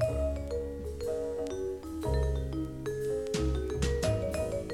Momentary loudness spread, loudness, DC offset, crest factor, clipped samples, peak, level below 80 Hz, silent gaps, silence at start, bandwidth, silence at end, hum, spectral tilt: 6 LU; -33 LUFS; under 0.1%; 16 dB; under 0.1%; -16 dBFS; -38 dBFS; none; 0 s; 15.5 kHz; 0 s; none; -6.5 dB/octave